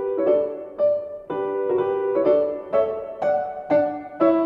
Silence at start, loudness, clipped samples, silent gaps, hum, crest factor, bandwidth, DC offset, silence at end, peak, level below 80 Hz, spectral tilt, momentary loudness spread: 0 s; -23 LUFS; under 0.1%; none; none; 14 dB; 5.2 kHz; under 0.1%; 0 s; -6 dBFS; -60 dBFS; -8.5 dB/octave; 7 LU